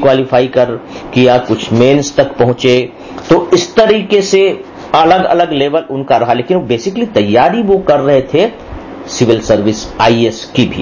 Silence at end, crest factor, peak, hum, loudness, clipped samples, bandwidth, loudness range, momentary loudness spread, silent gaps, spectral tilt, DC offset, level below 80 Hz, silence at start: 0 s; 10 dB; 0 dBFS; none; -11 LUFS; 0.2%; 7.4 kHz; 1 LU; 7 LU; none; -5.5 dB/octave; 0.1%; -38 dBFS; 0 s